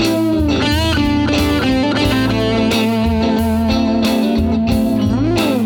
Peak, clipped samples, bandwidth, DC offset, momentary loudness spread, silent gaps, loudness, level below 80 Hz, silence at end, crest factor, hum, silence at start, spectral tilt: -2 dBFS; under 0.1%; 19.5 kHz; under 0.1%; 1 LU; none; -15 LUFS; -28 dBFS; 0 s; 12 dB; none; 0 s; -6 dB/octave